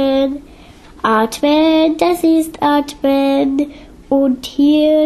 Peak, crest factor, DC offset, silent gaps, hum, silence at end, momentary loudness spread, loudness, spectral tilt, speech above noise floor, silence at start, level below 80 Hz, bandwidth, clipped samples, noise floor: -2 dBFS; 12 dB; under 0.1%; none; none; 0 s; 8 LU; -14 LUFS; -4.5 dB/octave; 26 dB; 0 s; -44 dBFS; 13.5 kHz; under 0.1%; -39 dBFS